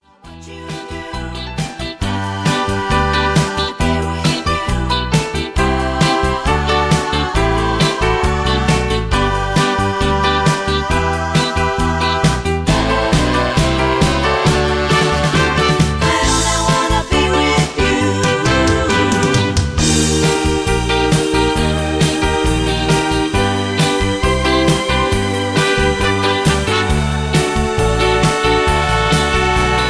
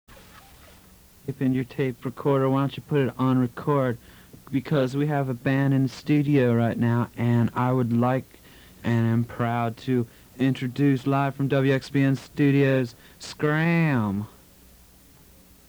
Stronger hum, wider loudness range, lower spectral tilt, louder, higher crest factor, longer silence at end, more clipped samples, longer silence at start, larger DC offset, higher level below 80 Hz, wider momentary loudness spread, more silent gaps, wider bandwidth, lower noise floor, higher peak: neither; about the same, 2 LU vs 3 LU; second, -4.5 dB/octave vs -8 dB/octave; first, -15 LUFS vs -24 LUFS; about the same, 12 dB vs 14 dB; second, 0 s vs 1.4 s; neither; first, 0.25 s vs 0.1 s; neither; first, -24 dBFS vs -58 dBFS; second, 4 LU vs 8 LU; neither; second, 11 kHz vs over 20 kHz; second, -37 dBFS vs -53 dBFS; first, -2 dBFS vs -10 dBFS